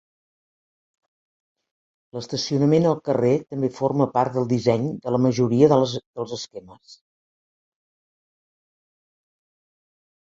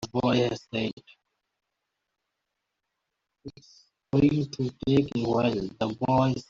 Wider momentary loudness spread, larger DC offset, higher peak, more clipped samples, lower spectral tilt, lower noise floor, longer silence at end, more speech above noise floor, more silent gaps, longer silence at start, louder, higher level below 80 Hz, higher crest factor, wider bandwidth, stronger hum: about the same, 15 LU vs 16 LU; neither; first, -2 dBFS vs -10 dBFS; neither; about the same, -7 dB/octave vs -6 dB/octave; first, under -90 dBFS vs -83 dBFS; first, 3.35 s vs 0.05 s; first, over 69 dB vs 57 dB; about the same, 6.06-6.14 s vs 0.93-0.97 s; first, 2.15 s vs 0 s; first, -21 LUFS vs -26 LUFS; second, -62 dBFS vs -56 dBFS; about the same, 22 dB vs 18 dB; about the same, 8 kHz vs 7.6 kHz; neither